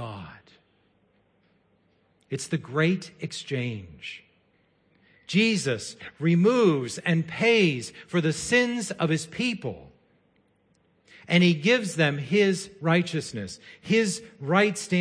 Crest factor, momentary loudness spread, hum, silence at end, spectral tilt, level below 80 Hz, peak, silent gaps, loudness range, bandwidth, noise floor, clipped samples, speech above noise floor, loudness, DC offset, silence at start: 18 dB; 17 LU; none; 0 s; -5 dB/octave; -64 dBFS; -8 dBFS; none; 8 LU; 10.5 kHz; -66 dBFS; under 0.1%; 41 dB; -25 LUFS; under 0.1%; 0 s